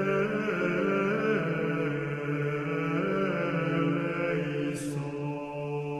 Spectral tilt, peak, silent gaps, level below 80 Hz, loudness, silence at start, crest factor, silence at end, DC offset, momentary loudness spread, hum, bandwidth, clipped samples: -7 dB/octave; -14 dBFS; none; -62 dBFS; -30 LUFS; 0 s; 14 dB; 0 s; under 0.1%; 7 LU; none; 13 kHz; under 0.1%